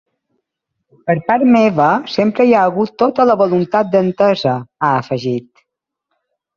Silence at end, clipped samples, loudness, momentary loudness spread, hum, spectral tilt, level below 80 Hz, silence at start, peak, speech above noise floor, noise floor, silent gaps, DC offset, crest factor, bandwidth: 1.15 s; under 0.1%; -14 LUFS; 8 LU; none; -7.5 dB/octave; -58 dBFS; 1.05 s; -2 dBFS; 61 dB; -75 dBFS; none; under 0.1%; 14 dB; 7 kHz